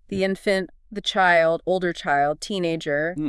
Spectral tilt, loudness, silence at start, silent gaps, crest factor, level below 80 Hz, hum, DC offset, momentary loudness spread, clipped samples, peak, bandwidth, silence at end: -5 dB/octave; -22 LUFS; 0.1 s; none; 18 dB; -52 dBFS; none; under 0.1%; 8 LU; under 0.1%; -6 dBFS; 12 kHz; 0 s